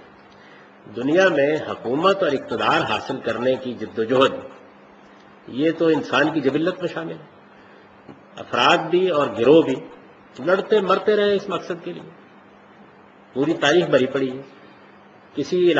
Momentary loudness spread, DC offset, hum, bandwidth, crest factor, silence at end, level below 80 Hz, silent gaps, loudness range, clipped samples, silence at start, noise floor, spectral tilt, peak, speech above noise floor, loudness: 17 LU; under 0.1%; none; 8.2 kHz; 20 dB; 0 s; -64 dBFS; none; 4 LU; under 0.1%; 0.85 s; -48 dBFS; -5.5 dB/octave; -2 dBFS; 28 dB; -20 LUFS